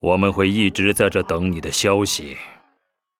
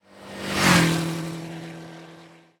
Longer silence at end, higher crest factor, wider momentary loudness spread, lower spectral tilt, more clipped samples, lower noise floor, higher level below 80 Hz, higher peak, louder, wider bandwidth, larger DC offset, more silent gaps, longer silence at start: first, 0.7 s vs 0.3 s; about the same, 18 dB vs 20 dB; second, 13 LU vs 23 LU; about the same, -4.5 dB/octave vs -4 dB/octave; neither; first, -70 dBFS vs -49 dBFS; first, -44 dBFS vs -52 dBFS; about the same, -2 dBFS vs -4 dBFS; about the same, -19 LUFS vs -21 LUFS; second, 17.5 kHz vs 19.5 kHz; neither; neither; about the same, 0.05 s vs 0.15 s